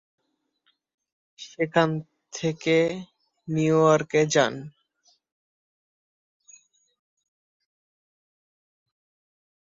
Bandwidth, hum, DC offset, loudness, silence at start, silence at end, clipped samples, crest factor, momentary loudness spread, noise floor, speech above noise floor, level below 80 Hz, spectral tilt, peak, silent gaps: 7.8 kHz; none; under 0.1%; -23 LUFS; 1.4 s; 5 s; under 0.1%; 22 dB; 22 LU; -73 dBFS; 50 dB; -68 dBFS; -5 dB/octave; -6 dBFS; none